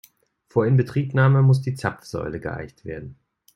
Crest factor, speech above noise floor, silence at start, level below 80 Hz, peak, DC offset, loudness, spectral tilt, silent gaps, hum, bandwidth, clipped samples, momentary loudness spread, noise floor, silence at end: 16 dB; 36 dB; 0.55 s; -54 dBFS; -6 dBFS; under 0.1%; -21 LUFS; -8.5 dB/octave; none; none; 10.5 kHz; under 0.1%; 18 LU; -57 dBFS; 0.4 s